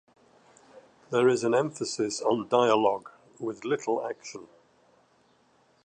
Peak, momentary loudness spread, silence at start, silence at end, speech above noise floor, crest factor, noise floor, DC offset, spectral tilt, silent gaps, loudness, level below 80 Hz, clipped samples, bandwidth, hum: -8 dBFS; 14 LU; 0.75 s; 1.4 s; 38 dB; 20 dB; -65 dBFS; under 0.1%; -4.5 dB/octave; none; -27 LUFS; -76 dBFS; under 0.1%; 9.8 kHz; none